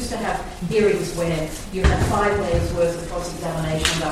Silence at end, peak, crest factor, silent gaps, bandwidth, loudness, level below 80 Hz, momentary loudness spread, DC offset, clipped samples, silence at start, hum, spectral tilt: 0 s; -2 dBFS; 20 dB; none; 15.5 kHz; -22 LUFS; -30 dBFS; 8 LU; under 0.1%; under 0.1%; 0 s; none; -5 dB/octave